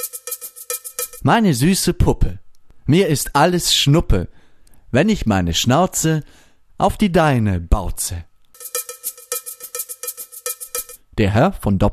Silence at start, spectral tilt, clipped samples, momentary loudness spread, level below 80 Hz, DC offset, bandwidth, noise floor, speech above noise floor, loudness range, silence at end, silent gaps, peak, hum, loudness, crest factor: 0 s; -4.5 dB/octave; under 0.1%; 13 LU; -30 dBFS; under 0.1%; 14 kHz; -44 dBFS; 28 dB; 8 LU; 0 s; none; -2 dBFS; none; -18 LUFS; 16 dB